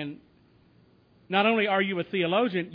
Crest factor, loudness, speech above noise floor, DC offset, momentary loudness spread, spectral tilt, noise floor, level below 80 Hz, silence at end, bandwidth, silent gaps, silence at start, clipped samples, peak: 18 dB; -25 LUFS; 35 dB; under 0.1%; 6 LU; -8.5 dB/octave; -60 dBFS; -72 dBFS; 0 s; 5.2 kHz; none; 0 s; under 0.1%; -10 dBFS